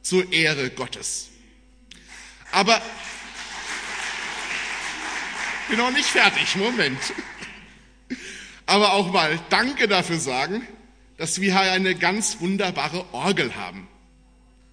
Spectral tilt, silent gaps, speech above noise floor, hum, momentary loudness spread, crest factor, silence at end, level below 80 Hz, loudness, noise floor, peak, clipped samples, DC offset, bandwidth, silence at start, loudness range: -3 dB/octave; none; 32 dB; none; 17 LU; 24 dB; 0.85 s; -56 dBFS; -22 LUFS; -54 dBFS; 0 dBFS; under 0.1%; under 0.1%; 11 kHz; 0.05 s; 5 LU